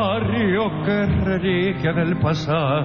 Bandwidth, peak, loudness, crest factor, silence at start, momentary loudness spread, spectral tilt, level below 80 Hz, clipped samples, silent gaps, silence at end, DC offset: 7 kHz; -8 dBFS; -20 LUFS; 12 dB; 0 s; 1 LU; -8 dB/octave; -38 dBFS; under 0.1%; none; 0 s; 0.2%